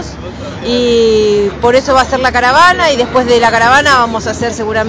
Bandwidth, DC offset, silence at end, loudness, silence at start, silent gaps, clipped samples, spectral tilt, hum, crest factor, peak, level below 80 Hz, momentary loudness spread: 10 kHz; under 0.1%; 0 s; -9 LUFS; 0 s; none; 0.3%; -4 dB/octave; none; 10 dB; 0 dBFS; -32 dBFS; 10 LU